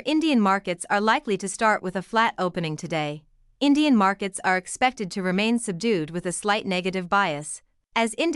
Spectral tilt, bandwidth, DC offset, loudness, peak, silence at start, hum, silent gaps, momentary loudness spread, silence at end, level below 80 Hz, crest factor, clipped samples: -4.5 dB/octave; 12 kHz; under 0.1%; -24 LUFS; -8 dBFS; 0.05 s; none; none; 8 LU; 0 s; -60 dBFS; 16 dB; under 0.1%